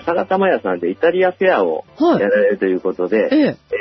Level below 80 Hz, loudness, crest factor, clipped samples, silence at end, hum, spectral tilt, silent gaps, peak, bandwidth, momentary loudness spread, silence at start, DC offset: -60 dBFS; -16 LUFS; 12 dB; under 0.1%; 0 s; none; -8 dB/octave; none; -4 dBFS; 6 kHz; 5 LU; 0 s; under 0.1%